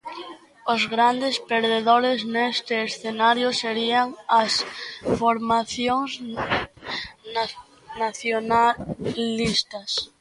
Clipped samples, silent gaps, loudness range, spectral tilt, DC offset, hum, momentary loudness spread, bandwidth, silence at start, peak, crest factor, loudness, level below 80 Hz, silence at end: under 0.1%; none; 4 LU; -3.5 dB/octave; under 0.1%; none; 12 LU; 11.5 kHz; 0.05 s; -4 dBFS; 20 dB; -23 LUFS; -54 dBFS; 0.15 s